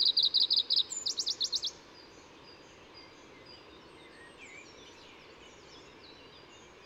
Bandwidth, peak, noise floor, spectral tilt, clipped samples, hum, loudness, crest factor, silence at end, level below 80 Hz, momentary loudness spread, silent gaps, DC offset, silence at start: 16 kHz; -16 dBFS; -54 dBFS; 0.5 dB/octave; under 0.1%; none; -28 LUFS; 20 dB; 0.25 s; -72 dBFS; 28 LU; none; under 0.1%; 0 s